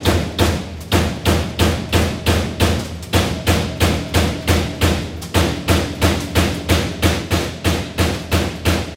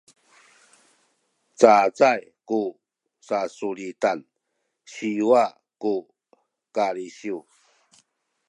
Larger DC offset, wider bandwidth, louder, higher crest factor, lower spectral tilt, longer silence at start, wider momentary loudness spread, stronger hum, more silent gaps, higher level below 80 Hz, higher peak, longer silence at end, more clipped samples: neither; first, 16.5 kHz vs 11 kHz; first, -18 LUFS vs -23 LUFS; second, 18 dB vs 24 dB; about the same, -5 dB/octave vs -4.5 dB/octave; second, 0 s vs 1.6 s; second, 3 LU vs 16 LU; neither; neither; first, -26 dBFS vs -76 dBFS; about the same, 0 dBFS vs 0 dBFS; second, 0 s vs 1.1 s; neither